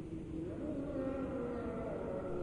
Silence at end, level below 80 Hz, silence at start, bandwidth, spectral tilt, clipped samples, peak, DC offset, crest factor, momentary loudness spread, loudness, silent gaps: 0 s; -54 dBFS; 0 s; 11 kHz; -9 dB/octave; under 0.1%; -28 dBFS; under 0.1%; 12 dB; 4 LU; -41 LUFS; none